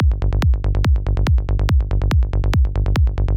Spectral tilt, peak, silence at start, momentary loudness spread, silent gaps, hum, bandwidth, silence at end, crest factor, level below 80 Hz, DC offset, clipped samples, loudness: -7.5 dB/octave; -8 dBFS; 0 s; 1 LU; none; none; 8 kHz; 0 s; 8 dB; -18 dBFS; under 0.1%; under 0.1%; -19 LUFS